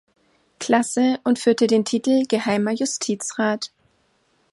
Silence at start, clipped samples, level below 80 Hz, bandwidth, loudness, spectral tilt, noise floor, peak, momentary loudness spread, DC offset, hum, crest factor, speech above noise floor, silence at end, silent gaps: 0.6 s; under 0.1%; -68 dBFS; 11.5 kHz; -21 LUFS; -4 dB/octave; -64 dBFS; -4 dBFS; 6 LU; under 0.1%; none; 18 dB; 44 dB; 0.85 s; none